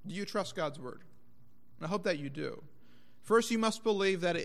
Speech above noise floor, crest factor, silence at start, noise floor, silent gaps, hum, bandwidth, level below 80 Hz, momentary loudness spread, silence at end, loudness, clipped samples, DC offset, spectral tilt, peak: 33 dB; 20 dB; 0.05 s; -66 dBFS; none; 60 Hz at -70 dBFS; 14.5 kHz; -74 dBFS; 15 LU; 0 s; -33 LUFS; under 0.1%; 0.4%; -4.5 dB/octave; -16 dBFS